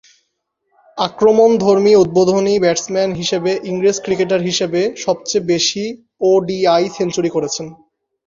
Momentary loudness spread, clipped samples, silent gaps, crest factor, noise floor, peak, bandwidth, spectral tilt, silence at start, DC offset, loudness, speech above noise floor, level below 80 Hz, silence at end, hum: 10 LU; under 0.1%; none; 16 dB; -71 dBFS; 0 dBFS; 7.6 kHz; -4.5 dB/octave; 0.95 s; under 0.1%; -15 LUFS; 56 dB; -54 dBFS; 0.55 s; none